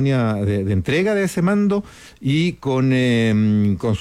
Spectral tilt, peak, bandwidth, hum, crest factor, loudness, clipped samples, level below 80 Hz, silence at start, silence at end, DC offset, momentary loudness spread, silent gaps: -7 dB/octave; -8 dBFS; 14 kHz; none; 10 dB; -19 LUFS; under 0.1%; -50 dBFS; 0 s; 0 s; under 0.1%; 4 LU; none